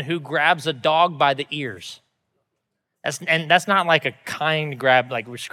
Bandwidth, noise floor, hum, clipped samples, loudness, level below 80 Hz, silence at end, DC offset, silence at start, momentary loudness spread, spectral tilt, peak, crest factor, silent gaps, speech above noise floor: 15.5 kHz; -78 dBFS; none; under 0.1%; -20 LUFS; -78 dBFS; 0.05 s; under 0.1%; 0 s; 12 LU; -4 dB/octave; -2 dBFS; 20 dB; none; 57 dB